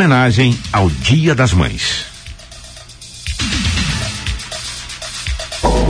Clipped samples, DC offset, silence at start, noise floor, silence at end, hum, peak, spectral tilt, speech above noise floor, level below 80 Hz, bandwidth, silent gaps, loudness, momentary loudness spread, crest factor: under 0.1%; under 0.1%; 0 s; -35 dBFS; 0 s; none; -2 dBFS; -5 dB/octave; 22 dB; -26 dBFS; 10.5 kHz; none; -16 LUFS; 21 LU; 14 dB